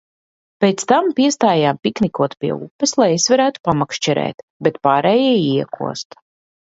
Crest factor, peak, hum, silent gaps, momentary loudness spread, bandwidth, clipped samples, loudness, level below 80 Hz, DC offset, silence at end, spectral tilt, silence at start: 16 dB; 0 dBFS; none; 2.71-2.79 s, 3.60-3.64 s, 4.34-4.60 s; 10 LU; 8 kHz; under 0.1%; -17 LUFS; -58 dBFS; under 0.1%; 0.65 s; -4.5 dB/octave; 0.6 s